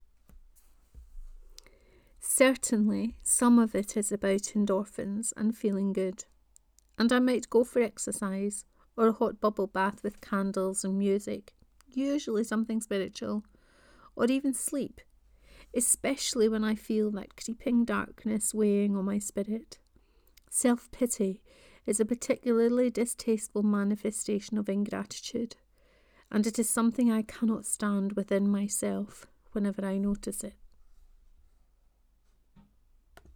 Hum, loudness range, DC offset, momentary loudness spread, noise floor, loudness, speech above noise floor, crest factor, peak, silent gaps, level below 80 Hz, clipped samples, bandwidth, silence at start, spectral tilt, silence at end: none; 5 LU; under 0.1%; 11 LU; -66 dBFS; -29 LUFS; 37 dB; 22 dB; -8 dBFS; none; -58 dBFS; under 0.1%; 19.5 kHz; 0.95 s; -4.5 dB/octave; 2.7 s